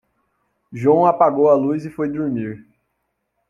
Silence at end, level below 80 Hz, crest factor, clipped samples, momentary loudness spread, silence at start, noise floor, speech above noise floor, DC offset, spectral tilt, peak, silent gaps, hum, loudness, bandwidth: 0.9 s; -60 dBFS; 18 dB; under 0.1%; 16 LU; 0.7 s; -73 dBFS; 56 dB; under 0.1%; -9.5 dB/octave; -2 dBFS; none; none; -17 LUFS; 7.2 kHz